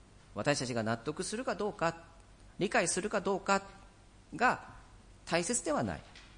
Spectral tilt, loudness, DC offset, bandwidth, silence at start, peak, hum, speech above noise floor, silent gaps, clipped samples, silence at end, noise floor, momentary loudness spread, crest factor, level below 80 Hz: -3.5 dB/octave; -33 LUFS; under 0.1%; 10.5 kHz; 0.3 s; -14 dBFS; none; 24 dB; none; under 0.1%; 0 s; -58 dBFS; 15 LU; 20 dB; -60 dBFS